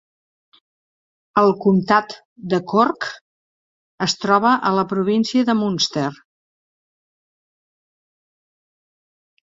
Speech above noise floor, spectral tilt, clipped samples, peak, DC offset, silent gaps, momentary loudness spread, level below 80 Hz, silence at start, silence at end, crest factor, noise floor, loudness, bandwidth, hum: over 72 dB; -5 dB/octave; under 0.1%; 0 dBFS; under 0.1%; 2.25-2.36 s, 3.21-3.98 s; 11 LU; -64 dBFS; 1.35 s; 3.4 s; 20 dB; under -90 dBFS; -18 LUFS; 7.8 kHz; none